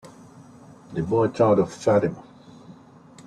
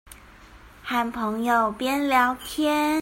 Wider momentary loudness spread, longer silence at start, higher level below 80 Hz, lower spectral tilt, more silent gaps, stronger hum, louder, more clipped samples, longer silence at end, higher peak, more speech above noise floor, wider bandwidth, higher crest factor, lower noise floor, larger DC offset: first, 13 LU vs 6 LU; about the same, 0.05 s vs 0.1 s; second, -58 dBFS vs -52 dBFS; first, -7.5 dB/octave vs -3.5 dB/octave; neither; neither; about the same, -22 LUFS vs -23 LUFS; neither; first, 0.55 s vs 0 s; about the same, -6 dBFS vs -6 dBFS; about the same, 27 dB vs 25 dB; second, 10.5 kHz vs 16.5 kHz; about the same, 18 dB vs 18 dB; about the same, -48 dBFS vs -48 dBFS; neither